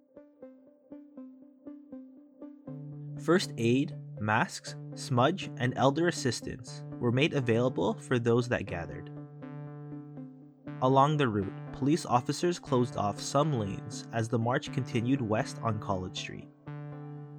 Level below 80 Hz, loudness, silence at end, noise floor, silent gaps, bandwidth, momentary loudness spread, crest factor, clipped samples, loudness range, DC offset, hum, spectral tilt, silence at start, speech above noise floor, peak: -64 dBFS; -30 LUFS; 0 s; -53 dBFS; none; 13.5 kHz; 20 LU; 20 dB; under 0.1%; 4 LU; under 0.1%; none; -6 dB/octave; 0.15 s; 24 dB; -10 dBFS